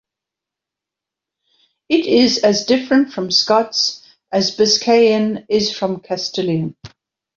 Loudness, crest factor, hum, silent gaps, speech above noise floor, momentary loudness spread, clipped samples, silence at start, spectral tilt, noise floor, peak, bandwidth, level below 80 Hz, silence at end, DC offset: -16 LUFS; 16 dB; none; none; 69 dB; 10 LU; under 0.1%; 1.9 s; -4 dB/octave; -85 dBFS; -2 dBFS; 7.6 kHz; -58 dBFS; 0.5 s; under 0.1%